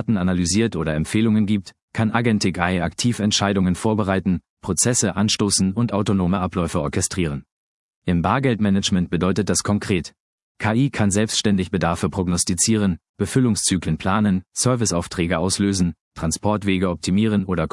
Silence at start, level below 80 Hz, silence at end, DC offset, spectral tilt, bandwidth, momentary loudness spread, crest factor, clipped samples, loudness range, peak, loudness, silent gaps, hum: 0 s; -46 dBFS; 0.05 s; under 0.1%; -4.5 dB/octave; 12 kHz; 6 LU; 18 dB; under 0.1%; 2 LU; -2 dBFS; -20 LUFS; 1.82-1.88 s, 4.49-4.57 s, 7.52-8.02 s, 10.20-10.55 s, 13.09-13.14 s, 16.01-16.11 s; none